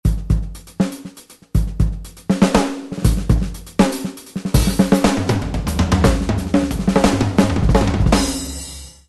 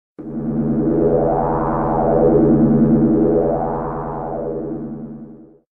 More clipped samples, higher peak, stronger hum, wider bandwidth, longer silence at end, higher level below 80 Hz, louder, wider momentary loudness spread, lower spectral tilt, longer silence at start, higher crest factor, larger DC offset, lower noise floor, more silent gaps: neither; first, 0 dBFS vs -4 dBFS; neither; first, 12.5 kHz vs 2.6 kHz; about the same, 0.2 s vs 0.3 s; first, -24 dBFS vs -34 dBFS; about the same, -18 LUFS vs -17 LUFS; about the same, 12 LU vs 14 LU; second, -6 dB/octave vs -13.5 dB/octave; second, 0.05 s vs 0.2 s; about the same, 16 dB vs 14 dB; neither; about the same, -39 dBFS vs -39 dBFS; neither